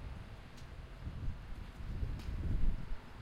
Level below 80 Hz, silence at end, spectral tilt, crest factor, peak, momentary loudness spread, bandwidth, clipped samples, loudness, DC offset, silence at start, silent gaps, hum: -40 dBFS; 0 s; -7 dB/octave; 16 dB; -22 dBFS; 12 LU; 7.2 kHz; under 0.1%; -45 LUFS; under 0.1%; 0 s; none; none